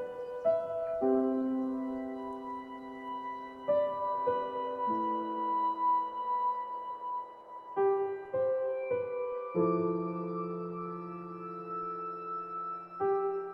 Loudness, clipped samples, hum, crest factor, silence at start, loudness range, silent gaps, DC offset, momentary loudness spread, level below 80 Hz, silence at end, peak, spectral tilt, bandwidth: -34 LUFS; under 0.1%; none; 18 dB; 0 s; 3 LU; none; under 0.1%; 11 LU; -74 dBFS; 0 s; -16 dBFS; -9.5 dB/octave; 5.6 kHz